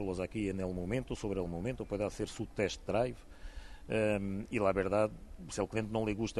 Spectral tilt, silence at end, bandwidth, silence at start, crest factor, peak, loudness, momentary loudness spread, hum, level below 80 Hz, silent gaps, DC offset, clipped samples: -6 dB/octave; 0 s; 12 kHz; 0 s; 18 dB; -16 dBFS; -36 LUFS; 12 LU; none; -50 dBFS; none; under 0.1%; under 0.1%